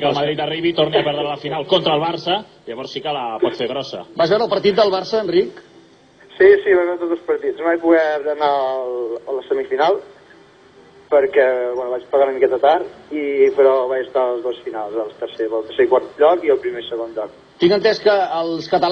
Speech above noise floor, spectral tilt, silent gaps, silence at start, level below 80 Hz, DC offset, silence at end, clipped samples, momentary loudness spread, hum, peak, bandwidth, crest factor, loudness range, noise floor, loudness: 31 dB; -6 dB/octave; none; 0 s; -60 dBFS; under 0.1%; 0 s; under 0.1%; 11 LU; none; 0 dBFS; 6.6 kHz; 18 dB; 3 LU; -48 dBFS; -18 LUFS